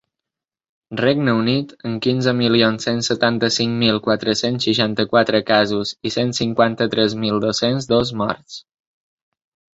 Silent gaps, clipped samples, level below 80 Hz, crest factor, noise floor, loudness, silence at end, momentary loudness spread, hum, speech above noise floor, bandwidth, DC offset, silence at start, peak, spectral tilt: none; under 0.1%; -54 dBFS; 16 dB; -85 dBFS; -18 LUFS; 1.15 s; 7 LU; none; 67 dB; 8 kHz; under 0.1%; 0.9 s; -2 dBFS; -5 dB/octave